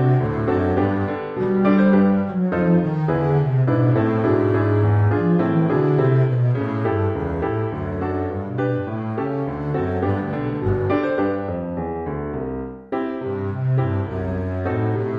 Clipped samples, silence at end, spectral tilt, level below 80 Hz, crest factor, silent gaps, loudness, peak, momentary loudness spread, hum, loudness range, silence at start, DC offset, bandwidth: under 0.1%; 0 s; -11 dB/octave; -44 dBFS; 16 dB; none; -21 LUFS; -4 dBFS; 8 LU; none; 6 LU; 0 s; under 0.1%; 5.2 kHz